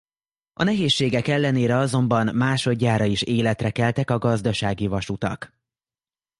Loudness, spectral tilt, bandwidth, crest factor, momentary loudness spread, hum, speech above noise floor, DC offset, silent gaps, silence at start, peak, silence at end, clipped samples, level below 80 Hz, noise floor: -22 LUFS; -6 dB/octave; 11.5 kHz; 16 dB; 6 LU; none; over 69 dB; under 0.1%; none; 0.6 s; -6 dBFS; 0.95 s; under 0.1%; -48 dBFS; under -90 dBFS